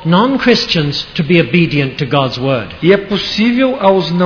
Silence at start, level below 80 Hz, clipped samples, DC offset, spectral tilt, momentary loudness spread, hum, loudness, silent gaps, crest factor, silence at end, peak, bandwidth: 0 s; -42 dBFS; 0.1%; under 0.1%; -6.5 dB/octave; 6 LU; none; -12 LUFS; none; 12 dB; 0 s; 0 dBFS; 5.4 kHz